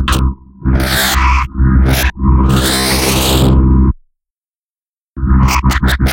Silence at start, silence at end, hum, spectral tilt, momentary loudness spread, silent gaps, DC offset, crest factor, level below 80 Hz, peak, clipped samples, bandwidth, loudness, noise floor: 0 s; 0 s; none; -4.5 dB/octave; 6 LU; 4.30-4.35 s, 4.56-4.74 s, 4.82-5.14 s; under 0.1%; 12 dB; -14 dBFS; 0 dBFS; under 0.1%; 17 kHz; -12 LUFS; under -90 dBFS